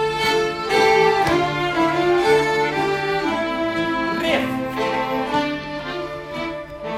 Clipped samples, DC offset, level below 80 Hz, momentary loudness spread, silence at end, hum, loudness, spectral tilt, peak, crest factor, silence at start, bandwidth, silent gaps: under 0.1%; under 0.1%; -48 dBFS; 12 LU; 0 s; none; -20 LUFS; -4.5 dB/octave; -4 dBFS; 16 dB; 0 s; 15.5 kHz; none